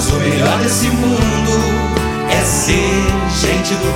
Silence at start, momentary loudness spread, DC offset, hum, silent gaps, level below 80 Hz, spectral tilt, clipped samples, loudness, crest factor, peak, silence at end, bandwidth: 0 s; 3 LU; under 0.1%; none; none; -24 dBFS; -4.5 dB/octave; under 0.1%; -14 LUFS; 14 dB; 0 dBFS; 0 s; 17 kHz